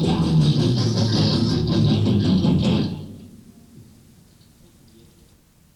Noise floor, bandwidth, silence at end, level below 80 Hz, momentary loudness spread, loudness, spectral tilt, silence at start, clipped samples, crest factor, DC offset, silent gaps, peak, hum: -54 dBFS; 11.5 kHz; 2.4 s; -42 dBFS; 5 LU; -19 LUFS; -7 dB/octave; 0 s; under 0.1%; 14 dB; under 0.1%; none; -8 dBFS; none